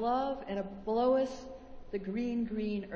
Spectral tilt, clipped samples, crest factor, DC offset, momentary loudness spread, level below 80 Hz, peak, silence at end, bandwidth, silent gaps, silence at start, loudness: -7 dB/octave; under 0.1%; 16 dB; under 0.1%; 15 LU; -58 dBFS; -18 dBFS; 0 s; 8 kHz; none; 0 s; -34 LUFS